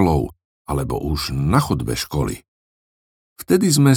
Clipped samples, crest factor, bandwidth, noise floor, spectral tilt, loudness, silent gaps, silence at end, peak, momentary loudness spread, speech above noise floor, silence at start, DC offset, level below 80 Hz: under 0.1%; 18 dB; 19.5 kHz; under -90 dBFS; -5.5 dB/octave; -20 LUFS; 0.45-0.65 s, 2.48-3.36 s; 0 s; 0 dBFS; 14 LU; over 72 dB; 0 s; under 0.1%; -36 dBFS